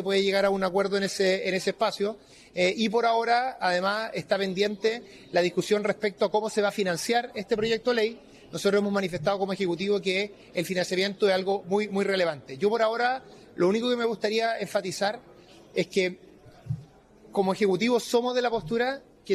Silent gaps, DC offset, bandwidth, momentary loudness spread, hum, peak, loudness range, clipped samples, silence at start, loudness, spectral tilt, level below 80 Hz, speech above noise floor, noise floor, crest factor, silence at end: none; under 0.1%; 14 kHz; 7 LU; none; -12 dBFS; 2 LU; under 0.1%; 0 s; -26 LUFS; -4.5 dB/octave; -64 dBFS; 27 dB; -53 dBFS; 14 dB; 0 s